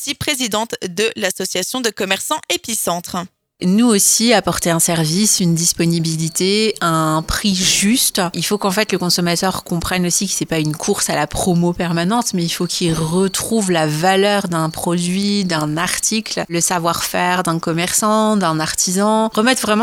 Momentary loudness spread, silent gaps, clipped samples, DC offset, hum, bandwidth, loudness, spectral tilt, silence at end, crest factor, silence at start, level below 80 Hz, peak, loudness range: 6 LU; none; under 0.1%; under 0.1%; none; 17 kHz; -16 LUFS; -3.5 dB/octave; 0 s; 16 dB; 0 s; -42 dBFS; 0 dBFS; 3 LU